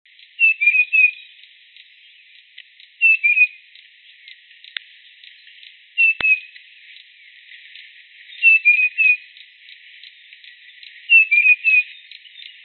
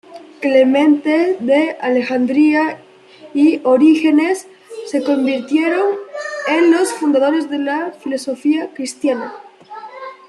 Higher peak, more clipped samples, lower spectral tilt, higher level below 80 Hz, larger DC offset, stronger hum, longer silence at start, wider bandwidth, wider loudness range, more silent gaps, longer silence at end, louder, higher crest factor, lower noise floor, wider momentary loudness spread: about the same, -4 dBFS vs -2 dBFS; neither; second, -2.5 dB/octave vs -4 dB/octave; about the same, -72 dBFS vs -68 dBFS; neither; neither; first, 0.4 s vs 0.1 s; second, 4.4 kHz vs 12 kHz; first, 6 LU vs 3 LU; neither; first, 0.7 s vs 0.15 s; about the same, -13 LUFS vs -15 LUFS; about the same, 18 dB vs 14 dB; first, -49 dBFS vs -35 dBFS; first, 21 LU vs 14 LU